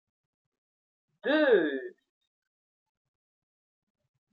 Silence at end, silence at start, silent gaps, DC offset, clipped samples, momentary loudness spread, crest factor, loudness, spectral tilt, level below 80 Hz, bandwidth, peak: 2.45 s; 1.25 s; none; under 0.1%; under 0.1%; 16 LU; 22 dB; -27 LUFS; -7 dB/octave; -90 dBFS; 5 kHz; -12 dBFS